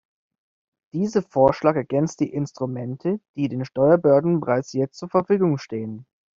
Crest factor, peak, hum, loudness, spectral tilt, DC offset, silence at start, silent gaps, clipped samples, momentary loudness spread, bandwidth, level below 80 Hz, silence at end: 20 dB; -4 dBFS; none; -22 LUFS; -8 dB/octave; under 0.1%; 0.95 s; 3.29-3.34 s; under 0.1%; 11 LU; 7.6 kHz; -58 dBFS; 0.35 s